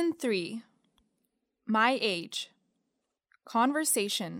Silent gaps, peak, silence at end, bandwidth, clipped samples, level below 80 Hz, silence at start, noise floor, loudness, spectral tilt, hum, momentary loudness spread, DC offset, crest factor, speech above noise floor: none; -12 dBFS; 0 s; 17 kHz; under 0.1%; -86 dBFS; 0 s; -82 dBFS; -29 LUFS; -2.5 dB/octave; none; 16 LU; under 0.1%; 20 dB; 53 dB